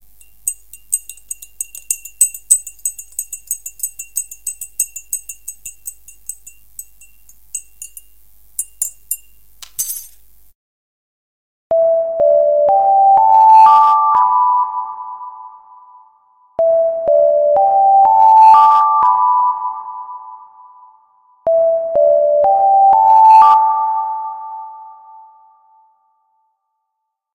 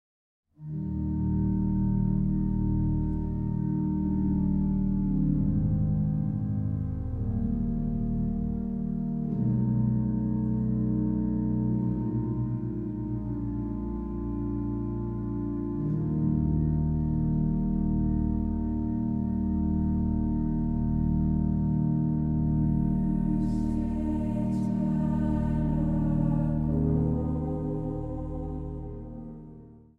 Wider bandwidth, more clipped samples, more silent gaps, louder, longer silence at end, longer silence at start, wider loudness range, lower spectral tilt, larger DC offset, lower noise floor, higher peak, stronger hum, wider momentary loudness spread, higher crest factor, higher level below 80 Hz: first, 17 kHz vs 2.8 kHz; neither; first, 10.55-11.70 s vs none; first, -12 LUFS vs -28 LUFS; first, 2.45 s vs 0.2 s; second, 0.45 s vs 0.6 s; first, 16 LU vs 3 LU; second, -0.5 dB/octave vs -12 dB/octave; neither; first, -75 dBFS vs -49 dBFS; first, 0 dBFS vs -14 dBFS; neither; first, 23 LU vs 6 LU; about the same, 14 dB vs 14 dB; second, -58 dBFS vs -36 dBFS